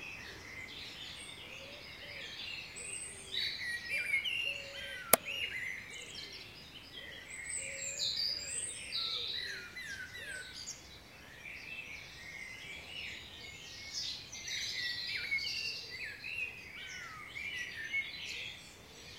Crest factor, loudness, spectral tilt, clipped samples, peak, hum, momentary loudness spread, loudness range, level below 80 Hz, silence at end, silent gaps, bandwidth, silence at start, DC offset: 40 dB; -39 LUFS; -0.5 dB/octave; under 0.1%; 0 dBFS; none; 13 LU; 10 LU; -66 dBFS; 0 s; none; 16 kHz; 0 s; under 0.1%